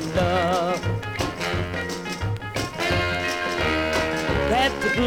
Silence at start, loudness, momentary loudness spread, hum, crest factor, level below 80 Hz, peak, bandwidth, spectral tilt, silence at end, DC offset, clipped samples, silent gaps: 0 s; -24 LUFS; 7 LU; none; 14 dB; -38 dBFS; -8 dBFS; 17.5 kHz; -5 dB/octave; 0 s; under 0.1%; under 0.1%; none